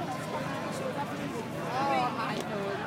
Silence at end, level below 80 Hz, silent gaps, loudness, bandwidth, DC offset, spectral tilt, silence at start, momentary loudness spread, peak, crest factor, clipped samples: 0 s; -64 dBFS; none; -33 LUFS; 16 kHz; under 0.1%; -5 dB/octave; 0 s; 6 LU; -16 dBFS; 16 dB; under 0.1%